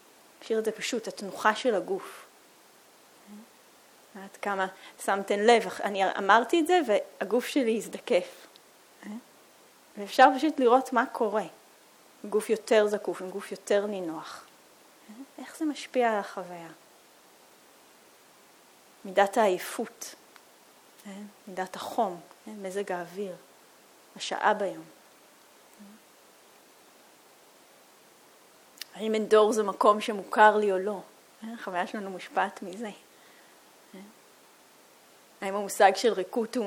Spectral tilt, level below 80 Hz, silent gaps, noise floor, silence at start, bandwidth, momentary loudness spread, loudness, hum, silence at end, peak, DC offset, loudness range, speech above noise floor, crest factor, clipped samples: -3.5 dB/octave; -84 dBFS; none; -57 dBFS; 0.4 s; 19 kHz; 23 LU; -27 LUFS; none; 0 s; -6 dBFS; under 0.1%; 11 LU; 30 dB; 24 dB; under 0.1%